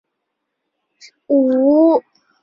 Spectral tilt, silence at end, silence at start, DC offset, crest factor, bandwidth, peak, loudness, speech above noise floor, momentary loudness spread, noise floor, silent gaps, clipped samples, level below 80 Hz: -7 dB/octave; 0.4 s; 1.3 s; under 0.1%; 14 dB; 7 kHz; -4 dBFS; -14 LUFS; 62 dB; 6 LU; -76 dBFS; none; under 0.1%; -66 dBFS